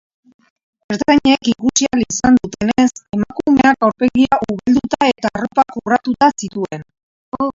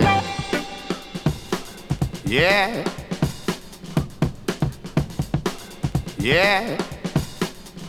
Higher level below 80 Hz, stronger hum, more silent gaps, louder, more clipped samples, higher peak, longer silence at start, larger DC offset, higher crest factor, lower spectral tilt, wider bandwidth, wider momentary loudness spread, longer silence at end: second, -44 dBFS vs -38 dBFS; neither; first, 7.03-7.32 s vs none; first, -15 LUFS vs -24 LUFS; neither; about the same, 0 dBFS vs -2 dBFS; first, 0.9 s vs 0 s; neither; about the same, 16 dB vs 20 dB; about the same, -4 dB/octave vs -5 dB/octave; second, 7.6 kHz vs 17 kHz; about the same, 11 LU vs 12 LU; about the same, 0.05 s vs 0 s